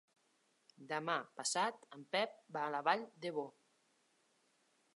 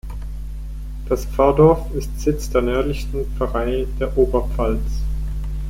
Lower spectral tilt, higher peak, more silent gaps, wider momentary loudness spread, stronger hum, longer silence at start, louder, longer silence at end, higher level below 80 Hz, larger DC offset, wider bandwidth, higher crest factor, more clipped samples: second, -2.5 dB/octave vs -7 dB/octave; second, -18 dBFS vs -2 dBFS; neither; second, 8 LU vs 18 LU; neither; first, 0.8 s vs 0.05 s; second, -40 LUFS vs -20 LUFS; first, 1.45 s vs 0 s; second, under -90 dBFS vs -24 dBFS; neither; second, 11.5 kHz vs 16 kHz; first, 24 dB vs 18 dB; neither